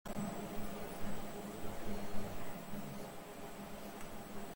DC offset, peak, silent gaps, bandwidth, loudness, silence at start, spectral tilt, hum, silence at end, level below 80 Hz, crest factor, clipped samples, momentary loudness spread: under 0.1%; -24 dBFS; none; 17 kHz; -47 LUFS; 0.05 s; -5 dB/octave; none; 0 s; -54 dBFS; 16 dB; under 0.1%; 6 LU